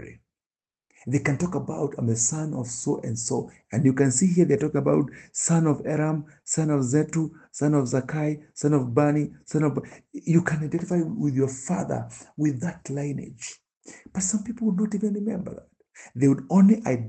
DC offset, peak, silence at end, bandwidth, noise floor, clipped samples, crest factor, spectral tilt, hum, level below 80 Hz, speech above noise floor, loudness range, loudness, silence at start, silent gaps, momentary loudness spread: under 0.1%; -6 dBFS; 0 s; 9 kHz; under -90 dBFS; under 0.1%; 18 dB; -6.5 dB/octave; none; -60 dBFS; over 66 dB; 6 LU; -25 LUFS; 0 s; 0.46-0.50 s, 13.77-13.81 s; 12 LU